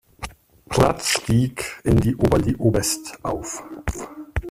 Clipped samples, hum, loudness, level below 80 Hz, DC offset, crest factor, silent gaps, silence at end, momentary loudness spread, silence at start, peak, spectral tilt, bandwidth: under 0.1%; none; -22 LUFS; -36 dBFS; under 0.1%; 20 dB; none; 0 s; 13 LU; 0.2 s; -2 dBFS; -5 dB/octave; 15.5 kHz